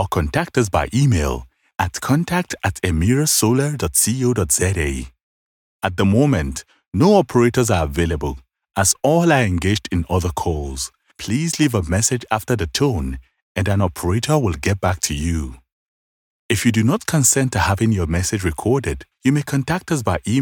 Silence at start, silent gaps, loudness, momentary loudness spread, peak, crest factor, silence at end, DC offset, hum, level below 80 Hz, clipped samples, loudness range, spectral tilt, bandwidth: 0 s; 5.23-5.80 s, 13.42-13.55 s, 15.72-16.49 s; -19 LUFS; 11 LU; -2 dBFS; 16 dB; 0 s; under 0.1%; none; -36 dBFS; under 0.1%; 3 LU; -5 dB/octave; 18 kHz